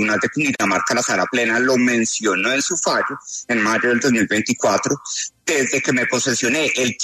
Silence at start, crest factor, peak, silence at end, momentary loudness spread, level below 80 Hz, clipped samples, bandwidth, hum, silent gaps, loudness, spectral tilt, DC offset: 0 s; 12 dB; -6 dBFS; 0 s; 5 LU; -62 dBFS; under 0.1%; 13.5 kHz; none; none; -18 LUFS; -3 dB/octave; under 0.1%